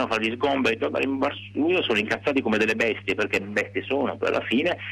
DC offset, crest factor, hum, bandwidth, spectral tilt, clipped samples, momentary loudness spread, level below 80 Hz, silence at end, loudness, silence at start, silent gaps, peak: under 0.1%; 12 dB; none; 13.5 kHz; -5 dB/octave; under 0.1%; 5 LU; -58 dBFS; 0 s; -24 LUFS; 0 s; none; -12 dBFS